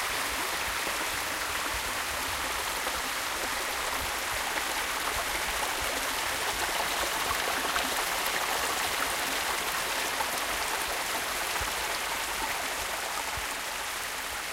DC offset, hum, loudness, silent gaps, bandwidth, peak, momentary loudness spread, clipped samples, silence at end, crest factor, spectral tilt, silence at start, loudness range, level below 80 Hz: under 0.1%; none; -29 LUFS; none; 16.5 kHz; -14 dBFS; 3 LU; under 0.1%; 0 s; 18 dB; -0.5 dB/octave; 0 s; 2 LU; -50 dBFS